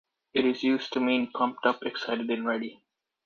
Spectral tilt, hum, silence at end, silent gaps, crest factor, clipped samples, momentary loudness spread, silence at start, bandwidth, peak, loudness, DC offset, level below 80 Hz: -5 dB/octave; none; 0.5 s; none; 20 dB; under 0.1%; 6 LU; 0.35 s; 7 kHz; -8 dBFS; -28 LUFS; under 0.1%; -74 dBFS